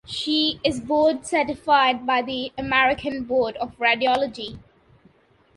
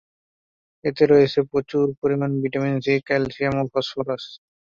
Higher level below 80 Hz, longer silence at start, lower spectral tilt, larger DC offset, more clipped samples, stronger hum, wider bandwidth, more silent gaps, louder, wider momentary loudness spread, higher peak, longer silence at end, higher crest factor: about the same, -52 dBFS vs -54 dBFS; second, 0.1 s vs 0.85 s; second, -3.5 dB/octave vs -7.5 dB/octave; neither; neither; neither; first, 11.5 kHz vs 7.2 kHz; second, none vs 1.98-2.02 s; about the same, -21 LUFS vs -22 LUFS; second, 9 LU vs 12 LU; about the same, -4 dBFS vs -4 dBFS; first, 1 s vs 0.35 s; about the same, 20 dB vs 18 dB